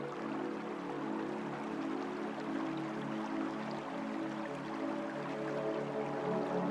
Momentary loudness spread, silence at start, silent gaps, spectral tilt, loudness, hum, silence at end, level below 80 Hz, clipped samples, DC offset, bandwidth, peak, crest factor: 4 LU; 0 s; none; -6.5 dB/octave; -39 LUFS; none; 0 s; -76 dBFS; under 0.1%; under 0.1%; 11.5 kHz; -24 dBFS; 14 dB